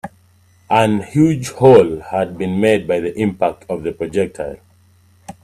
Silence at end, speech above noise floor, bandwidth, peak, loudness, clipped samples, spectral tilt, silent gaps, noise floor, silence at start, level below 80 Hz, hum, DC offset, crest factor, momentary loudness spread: 0.1 s; 37 dB; 14 kHz; 0 dBFS; -16 LUFS; under 0.1%; -7 dB/octave; none; -52 dBFS; 0.05 s; -50 dBFS; none; under 0.1%; 16 dB; 14 LU